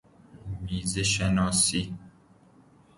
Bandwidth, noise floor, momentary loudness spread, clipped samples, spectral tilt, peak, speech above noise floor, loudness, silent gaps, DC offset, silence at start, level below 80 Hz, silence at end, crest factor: 11.5 kHz; -57 dBFS; 18 LU; under 0.1%; -3.5 dB/octave; -10 dBFS; 31 dB; -25 LUFS; none; under 0.1%; 0.35 s; -46 dBFS; 0.9 s; 18 dB